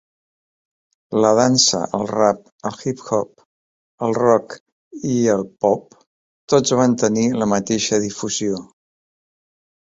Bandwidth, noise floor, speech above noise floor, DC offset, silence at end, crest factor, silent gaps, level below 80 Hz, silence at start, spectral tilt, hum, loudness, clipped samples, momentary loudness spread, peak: 8 kHz; under -90 dBFS; over 72 dB; under 0.1%; 1.25 s; 20 dB; 2.52-2.59 s, 3.45-3.98 s, 4.60-4.66 s, 4.72-4.91 s, 6.07-6.48 s; -58 dBFS; 1.1 s; -4 dB/octave; none; -18 LUFS; under 0.1%; 12 LU; -2 dBFS